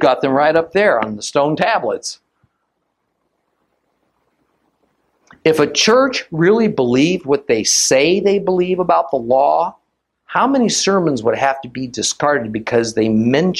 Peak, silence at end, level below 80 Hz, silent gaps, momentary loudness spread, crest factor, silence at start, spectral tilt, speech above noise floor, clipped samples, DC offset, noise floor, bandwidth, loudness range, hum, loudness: 0 dBFS; 0 s; -56 dBFS; none; 7 LU; 16 dB; 0 s; -3.5 dB/octave; 55 dB; under 0.1%; under 0.1%; -70 dBFS; 14.5 kHz; 8 LU; none; -15 LUFS